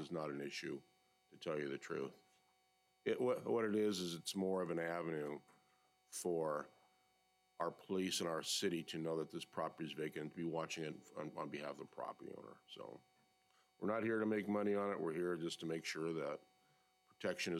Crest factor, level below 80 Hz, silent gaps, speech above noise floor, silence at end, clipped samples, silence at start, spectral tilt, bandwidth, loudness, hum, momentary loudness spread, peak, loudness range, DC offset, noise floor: 16 dB; -88 dBFS; none; 36 dB; 0 s; under 0.1%; 0 s; -4.5 dB/octave; 16 kHz; -43 LUFS; none; 12 LU; -26 dBFS; 6 LU; under 0.1%; -79 dBFS